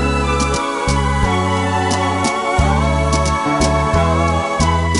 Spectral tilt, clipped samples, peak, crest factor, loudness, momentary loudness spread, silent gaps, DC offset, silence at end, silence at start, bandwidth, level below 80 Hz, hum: -5 dB/octave; under 0.1%; -2 dBFS; 14 dB; -16 LUFS; 2 LU; none; under 0.1%; 0 s; 0 s; 11.5 kHz; -22 dBFS; none